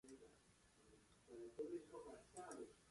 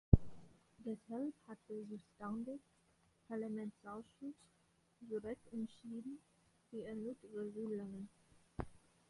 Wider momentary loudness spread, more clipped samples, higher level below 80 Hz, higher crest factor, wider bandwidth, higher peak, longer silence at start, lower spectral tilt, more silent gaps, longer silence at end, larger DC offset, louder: about the same, 13 LU vs 11 LU; neither; second, -82 dBFS vs -52 dBFS; second, 18 dB vs 34 dB; about the same, 11.5 kHz vs 11.5 kHz; second, -38 dBFS vs -10 dBFS; about the same, 0.05 s vs 0.1 s; second, -4.5 dB/octave vs -9.5 dB/octave; neither; second, 0 s vs 0.35 s; neither; second, -56 LUFS vs -46 LUFS